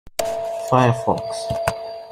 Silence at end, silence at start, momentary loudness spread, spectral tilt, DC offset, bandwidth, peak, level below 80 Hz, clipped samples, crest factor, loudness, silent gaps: 0 s; 0.05 s; 9 LU; -5.5 dB/octave; under 0.1%; 16 kHz; -2 dBFS; -48 dBFS; under 0.1%; 20 dB; -21 LUFS; none